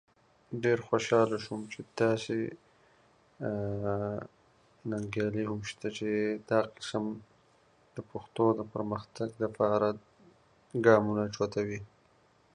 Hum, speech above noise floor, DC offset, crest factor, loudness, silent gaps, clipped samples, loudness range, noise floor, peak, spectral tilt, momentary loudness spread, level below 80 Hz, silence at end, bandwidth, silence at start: none; 35 dB; under 0.1%; 24 dB; -32 LUFS; none; under 0.1%; 5 LU; -66 dBFS; -8 dBFS; -6 dB/octave; 15 LU; -64 dBFS; 0.7 s; 10.5 kHz; 0.5 s